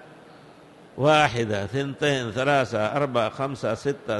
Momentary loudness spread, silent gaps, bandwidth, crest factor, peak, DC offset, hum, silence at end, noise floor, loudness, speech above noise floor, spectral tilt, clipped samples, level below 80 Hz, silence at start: 9 LU; none; 11.5 kHz; 20 dB; -4 dBFS; under 0.1%; none; 0 s; -49 dBFS; -24 LUFS; 25 dB; -5.5 dB/octave; under 0.1%; -58 dBFS; 0 s